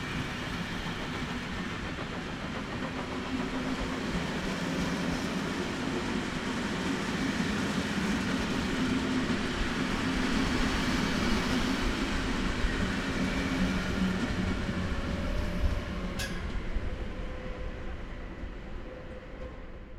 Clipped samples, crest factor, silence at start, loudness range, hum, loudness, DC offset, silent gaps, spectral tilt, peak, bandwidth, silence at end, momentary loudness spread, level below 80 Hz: under 0.1%; 16 dB; 0 s; 7 LU; none; -32 LUFS; under 0.1%; none; -5 dB/octave; -14 dBFS; 15.5 kHz; 0 s; 11 LU; -38 dBFS